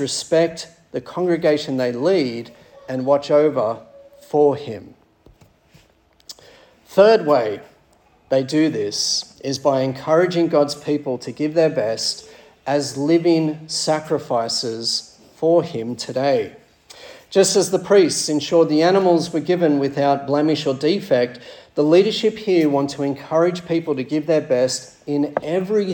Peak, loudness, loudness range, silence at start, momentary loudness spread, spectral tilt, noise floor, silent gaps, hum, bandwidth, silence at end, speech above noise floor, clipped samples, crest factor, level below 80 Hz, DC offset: -2 dBFS; -19 LUFS; 4 LU; 0 s; 12 LU; -4.5 dB/octave; -56 dBFS; none; none; 18 kHz; 0 s; 38 dB; under 0.1%; 18 dB; -64 dBFS; under 0.1%